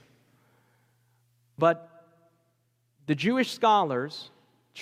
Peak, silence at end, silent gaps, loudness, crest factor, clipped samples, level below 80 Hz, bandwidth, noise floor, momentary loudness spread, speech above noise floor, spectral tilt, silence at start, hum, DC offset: -10 dBFS; 0 s; none; -26 LUFS; 20 dB; under 0.1%; -80 dBFS; 15.5 kHz; -72 dBFS; 21 LU; 47 dB; -5.5 dB/octave; 1.6 s; none; under 0.1%